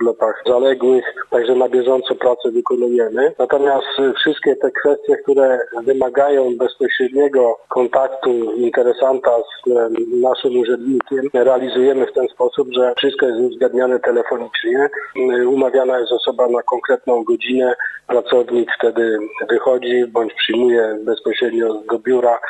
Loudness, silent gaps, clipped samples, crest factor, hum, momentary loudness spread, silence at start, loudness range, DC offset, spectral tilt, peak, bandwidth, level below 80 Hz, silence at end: -16 LUFS; none; under 0.1%; 14 dB; none; 4 LU; 0 s; 1 LU; under 0.1%; -5 dB/octave; -2 dBFS; 8.2 kHz; -66 dBFS; 0 s